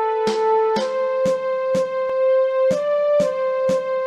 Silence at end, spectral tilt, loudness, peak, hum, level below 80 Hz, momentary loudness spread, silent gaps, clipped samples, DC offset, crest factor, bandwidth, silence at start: 0 s; -5 dB/octave; -20 LUFS; -8 dBFS; none; -62 dBFS; 3 LU; none; under 0.1%; under 0.1%; 10 dB; 10.5 kHz; 0 s